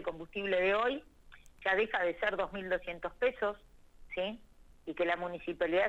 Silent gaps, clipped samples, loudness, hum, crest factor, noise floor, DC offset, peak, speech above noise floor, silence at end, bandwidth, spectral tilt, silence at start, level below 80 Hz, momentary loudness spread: none; under 0.1%; -34 LUFS; none; 16 dB; -57 dBFS; under 0.1%; -18 dBFS; 23 dB; 0 s; 8.4 kHz; -5.5 dB/octave; 0 s; -58 dBFS; 13 LU